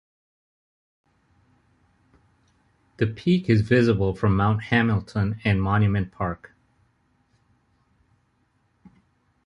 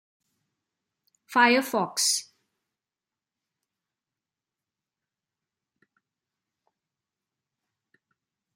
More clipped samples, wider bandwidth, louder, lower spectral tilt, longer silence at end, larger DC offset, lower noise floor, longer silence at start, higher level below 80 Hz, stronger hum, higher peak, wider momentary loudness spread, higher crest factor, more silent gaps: neither; second, 7.6 kHz vs 16 kHz; about the same, -23 LUFS vs -23 LUFS; first, -8.5 dB/octave vs -1.5 dB/octave; second, 3.1 s vs 6.35 s; neither; second, -67 dBFS vs under -90 dBFS; first, 3 s vs 1.3 s; first, -44 dBFS vs -86 dBFS; neither; about the same, -6 dBFS vs -6 dBFS; about the same, 9 LU vs 8 LU; second, 20 dB vs 26 dB; neither